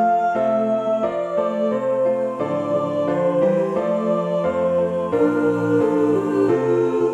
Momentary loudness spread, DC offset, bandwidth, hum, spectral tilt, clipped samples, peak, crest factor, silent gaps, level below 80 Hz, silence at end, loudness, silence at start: 4 LU; under 0.1%; 9.4 kHz; none; -8 dB/octave; under 0.1%; -6 dBFS; 12 dB; none; -60 dBFS; 0 s; -20 LUFS; 0 s